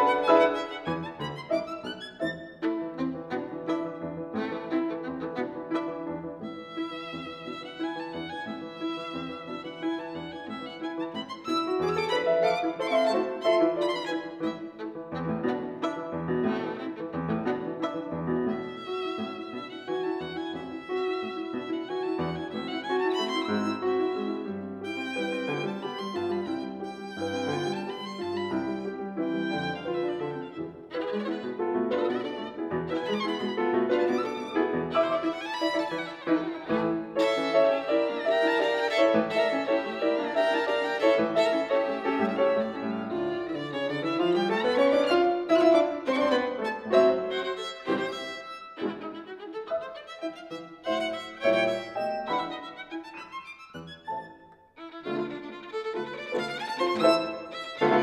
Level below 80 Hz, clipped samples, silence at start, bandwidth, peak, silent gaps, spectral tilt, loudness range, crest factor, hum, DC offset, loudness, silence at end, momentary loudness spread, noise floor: -66 dBFS; under 0.1%; 0 s; 11.5 kHz; -8 dBFS; none; -5.5 dB/octave; 10 LU; 20 dB; none; under 0.1%; -29 LUFS; 0 s; 13 LU; -52 dBFS